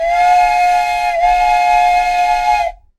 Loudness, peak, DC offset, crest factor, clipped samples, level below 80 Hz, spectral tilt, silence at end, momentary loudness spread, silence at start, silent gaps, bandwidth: -12 LUFS; -2 dBFS; under 0.1%; 10 dB; under 0.1%; -34 dBFS; -1 dB/octave; 0.25 s; 4 LU; 0 s; none; 13.5 kHz